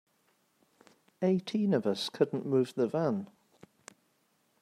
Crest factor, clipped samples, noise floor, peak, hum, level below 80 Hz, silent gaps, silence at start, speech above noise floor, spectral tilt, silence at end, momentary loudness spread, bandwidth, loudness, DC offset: 20 dB; under 0.1%; -73 dBFS; -14 dBFS; none; -80 dBFS; none; 1.2 s; 43 dB; -6.5 dB/octave; 1.35 s; 4 LU; 14 kHz; -31 LUFS; under 0.1%